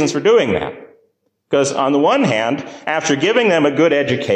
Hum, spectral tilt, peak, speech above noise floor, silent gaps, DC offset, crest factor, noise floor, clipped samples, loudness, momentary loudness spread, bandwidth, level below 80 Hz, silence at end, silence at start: none; -4.5 dB/octave; -4 dBFS; 47 dB; none; under 0.1%; 12 dB; -63 dBFS; under 0.1%; -15 LUFS; 8 LU; 9.8 kHz; -52 dBFS; 0 s; 0 s